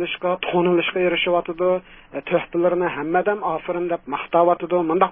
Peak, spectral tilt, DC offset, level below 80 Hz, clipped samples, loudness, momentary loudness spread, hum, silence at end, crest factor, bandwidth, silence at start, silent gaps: -2 dBFS; -10.5 dB/octave; under 0.1%; -56 dBFS; under 0.1%; -21 LUFS; 6 LU; none; 0 s; 20 dB; 3.7 kHz; 0 s; none